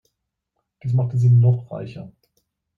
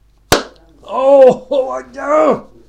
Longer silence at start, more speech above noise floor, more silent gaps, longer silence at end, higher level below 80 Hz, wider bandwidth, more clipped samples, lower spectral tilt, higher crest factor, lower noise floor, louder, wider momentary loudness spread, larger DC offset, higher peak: first, 0.85 s vs 0.3 s; first, 60 dB vs 24 dB; neither; first, 0.7 s vs 0.25 s; second, -58 dBFS vs -40 dBFS; second, 4.1 kHz vs 17 kHz; second, under 0.1% vs 0.3%; first, -10.5 dB/octave vs -4 dB/octave; about the same, 14 dB vs 14 dB; first, -78 dBFS vs -35 dBFS; second, -18 LUFS vs -13 LUFS; first, 19 LU vs 15 LU; neither; second, -6 dBFS vs 0 dBFS